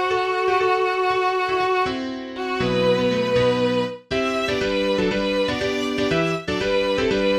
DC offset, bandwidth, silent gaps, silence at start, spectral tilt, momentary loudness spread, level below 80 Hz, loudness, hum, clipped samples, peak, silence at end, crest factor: under 0.1%; 13 kHz; none; 0 s; -5.5 dB/octave; 5 LU; -46 dBFS; -21 LUFS; none; under 0.1%; -8 dBFS; 0 s; 12 dB